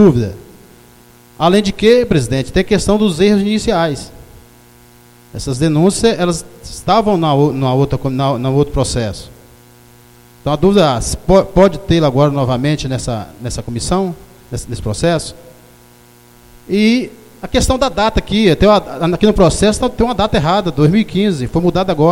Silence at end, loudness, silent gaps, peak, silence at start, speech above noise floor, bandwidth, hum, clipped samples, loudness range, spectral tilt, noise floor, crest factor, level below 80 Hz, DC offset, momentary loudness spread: 0 s; -14 LUFS; none; 0 dBFS; 0 s; 31 dB; 16.5 kHz; 60 Hz at -45 dBFS; under 0.1%; 6 LU; -6 dB/octave; -44 dBFS; 14 dB; -30 dBFS; under 0.1%; 13 LU